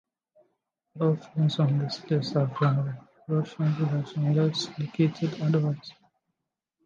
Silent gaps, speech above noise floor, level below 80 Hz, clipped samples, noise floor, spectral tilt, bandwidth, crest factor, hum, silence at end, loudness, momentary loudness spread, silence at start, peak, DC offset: none; 58 dB; -72 dBFS; under 0.1%; -84 dBFS; -7.5 dB/octave; 7.4 kHz; 16 dB; none; 0.95 s; -27 LUFS; 6 LU; 0.95 s; -12 dBFS; under 0.1%